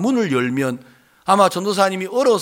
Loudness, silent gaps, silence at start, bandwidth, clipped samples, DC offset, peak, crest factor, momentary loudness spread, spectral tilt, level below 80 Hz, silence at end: -18 LUFS; none; 0 s; 17 kHz; under 0.1%; under 0.1%; -2 dBFS; 16 dB; 10 LU; -5 dB/octave; -66 dBFS; 0 s